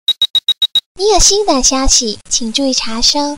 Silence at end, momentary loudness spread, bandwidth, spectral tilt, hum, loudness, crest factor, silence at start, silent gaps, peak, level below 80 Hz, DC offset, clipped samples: 0 s; 6 LU; 16.5 kHz; -1 dB/octave; none; -11 LUFS; 12 dB; 0.05 s; 0.30-0.34 s, 0.86-0.95 s; -2 dBFS; -26 dBFS; under 0.1%; under 0.1%